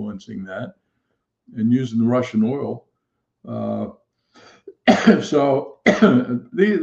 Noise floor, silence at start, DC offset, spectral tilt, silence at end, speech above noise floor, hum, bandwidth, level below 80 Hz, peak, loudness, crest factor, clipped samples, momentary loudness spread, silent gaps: -75 dBFS; 0 s; under 0.1%; -6.5 dB/octave; 0 s; 57 dB; none; 7.6 kHz; -60 dBFS; 0 dBFS; -19 LUFS; 20 dB; under 0.1%; 18 LU; none